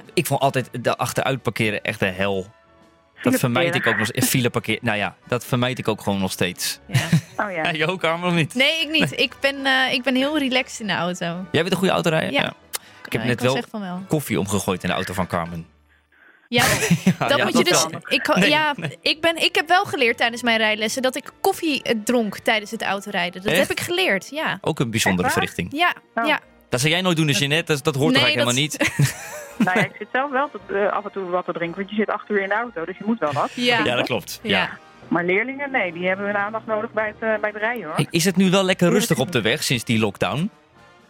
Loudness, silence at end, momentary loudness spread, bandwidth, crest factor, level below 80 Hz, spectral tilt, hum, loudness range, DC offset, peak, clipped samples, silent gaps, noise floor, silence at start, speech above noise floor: -21 LUFS; 0.6 s; 8 LU; 17 kHz; 18 dB; -56 dBFS; -4 dB/octave; none; 4 LU; under 0.1%; -4 dBFS; under 0.1%; none; -56 dBFS; 0.15 s; 35 dB